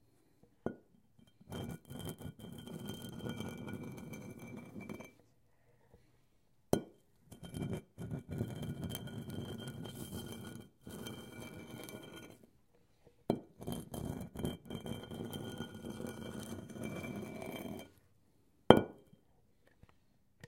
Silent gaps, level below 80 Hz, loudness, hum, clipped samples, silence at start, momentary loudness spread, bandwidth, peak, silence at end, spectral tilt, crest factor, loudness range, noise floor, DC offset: none; -62 dBFS; -41 LUFS; none; under 0.1%; 0.65 s; 11 LU; 17 kHz; -2 dBFS; 0 s; -6 dB/octave; 40 dB; 12 LU; -74 dBFS; under 0.1%